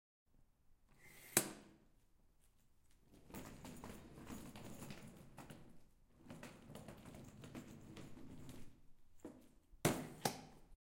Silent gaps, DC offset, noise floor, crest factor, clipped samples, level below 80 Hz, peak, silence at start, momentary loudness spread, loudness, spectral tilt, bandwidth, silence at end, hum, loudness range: none; under 0.1%; -72 dBFS; 36 dB; under 0.1%; -68 dBFS; -14 dBFS; 0.3 s; 21 LU; -47 LUFS; -3.5 dB/octave; 16.5 kHz; 0.15 s; none; 11 LU